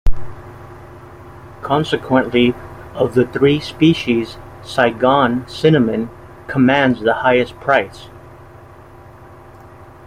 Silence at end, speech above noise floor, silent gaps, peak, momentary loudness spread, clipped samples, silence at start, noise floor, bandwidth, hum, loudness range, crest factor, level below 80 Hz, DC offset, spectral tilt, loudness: 0.4 s; 25 dB; none; -2 dBFS; 21 LU; under 0.1%; 0.05 s; -40 dBFS; 13.5 kHz; none; 4 LU; 16 dB; -30 dBFS; under 0.1%; -6.5 dB/octave; -16 LUFS